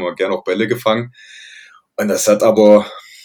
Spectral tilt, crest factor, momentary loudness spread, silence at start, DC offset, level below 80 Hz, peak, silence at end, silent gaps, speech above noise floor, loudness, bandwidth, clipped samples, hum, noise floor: -4.5 dB/octave; 16 dB; 17 LU; 0 s; under 0.1%; -66 dBFS; 0 dBFS; 0.25 s; none; 28 dB; -14 LUFS; 19.5 kHz; 0.2%; none; -43 dBFS